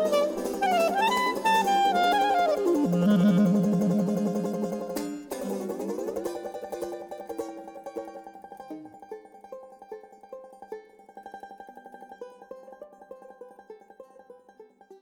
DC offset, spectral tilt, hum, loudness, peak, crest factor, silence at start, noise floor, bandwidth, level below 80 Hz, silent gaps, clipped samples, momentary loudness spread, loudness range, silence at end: under 0.1%; -6 dB/octave; none; -26 LUFS; -12 dBFS; 16 dB; 0 s; -54 dBFS; 19 kHz; -66 dBFS; none; under 0.1%; 24 LU; 23 LU; 0.05 s